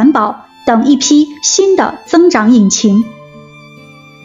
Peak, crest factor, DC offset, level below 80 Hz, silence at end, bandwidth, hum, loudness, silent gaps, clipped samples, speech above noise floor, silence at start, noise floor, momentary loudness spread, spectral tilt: 0 dBFS; 10 dB; under 0.1%; -52 dBFS; 0.85 s; 7.8 kHz; none; -10 LUFS; none; under 0.1%; 27 dB; 0 s; -36 dBFS; 6 LU; -4 dB/octave